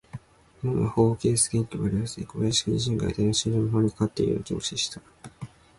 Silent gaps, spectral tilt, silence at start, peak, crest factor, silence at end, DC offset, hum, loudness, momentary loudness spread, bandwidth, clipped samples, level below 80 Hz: none; -5 dB/octave; 0.15 s; -10 dBFS; 16 dB; 0.3 s; under 0.1%; none; -26 LUFS; 19 LU; 11.5 kHz; under 0.1%; -48 dBFS